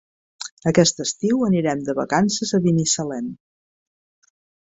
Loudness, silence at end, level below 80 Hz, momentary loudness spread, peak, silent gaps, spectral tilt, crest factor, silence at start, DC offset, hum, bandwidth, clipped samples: -20 LUFS; 1.35 s; -58 dBFS; 13 LU; -2 dBFS; 0.51-0.57 s; -4.5 dB/octave; 20 dB; 0.4 s; under 0.1%; none; 8.2 kHz; under 0.1%